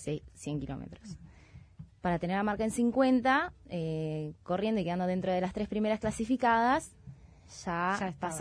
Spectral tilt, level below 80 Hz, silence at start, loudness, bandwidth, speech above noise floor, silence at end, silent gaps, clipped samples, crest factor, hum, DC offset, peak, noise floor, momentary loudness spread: -6 dB/octave; -56 dBFS; 0 s; -31 LUFS; 11 kHz; 23 dB; 0 s; none; under 0.1%; 18 dB; none; under 0.1%; -14 dBFS; -54 dBFS; 16 LU